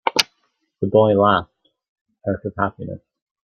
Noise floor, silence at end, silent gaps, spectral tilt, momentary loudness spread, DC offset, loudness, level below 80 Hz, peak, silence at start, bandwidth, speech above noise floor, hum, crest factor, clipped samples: -69 dBFS; 0.5 s; 1.89-2.05 s; -4.5 dB/octave; 18 LU; under 0.1%; -19 LUFS; -56 dBFS; 0 dBFS; 0.05 s; 13 kHz; 51 dB; none; 22 dB; under 0.1%